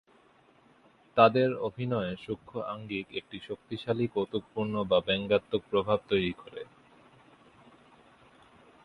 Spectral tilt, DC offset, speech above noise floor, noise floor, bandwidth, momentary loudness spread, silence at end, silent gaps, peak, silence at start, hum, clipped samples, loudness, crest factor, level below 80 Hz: -8 dB/octave; under 0.1%; 33 dB; -62 dBFS; 10.5 kHz; 16 LU; 2.2 s; none; -6 dBFS; 1.15 s; none; under 0.1%; -30 LUFS; 26 dB; -62 dBFS